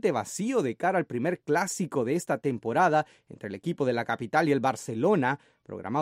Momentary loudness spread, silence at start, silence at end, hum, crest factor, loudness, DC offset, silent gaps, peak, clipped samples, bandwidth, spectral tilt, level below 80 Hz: 11 LU; 0.05 s; 0 s; none; 18 dB; -28 LUFS; under 0.1%; none; -10 dBFS; under 0.1%; 16 kHz; -5.5 dB/octave; -72 dBFS